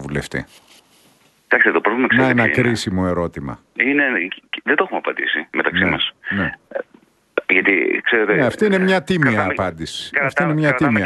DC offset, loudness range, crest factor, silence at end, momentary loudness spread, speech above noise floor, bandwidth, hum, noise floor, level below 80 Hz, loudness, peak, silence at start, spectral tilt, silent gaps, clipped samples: under 0.1%; 3 LU; 18 dB; 0 s; 12 LU; 37 dB; 12 kHz; none; -55 dBFS; -48 dBFS; -17 LUFS; 0 dBFS; 0 s; -5.5 dB/octave; none; under 0.1%